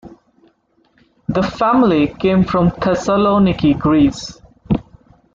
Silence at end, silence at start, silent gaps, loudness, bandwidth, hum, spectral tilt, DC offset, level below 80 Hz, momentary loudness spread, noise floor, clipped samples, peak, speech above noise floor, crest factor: 0.55 s; 0.05 s; none; -15 LUFS; 7.6 kHz; none; -7 dB/octave; under 0.1%; -38 dBFS; 9 LU; -58 dBFS; under 0.1%; -4 dBFS; 44 dB; 14 dB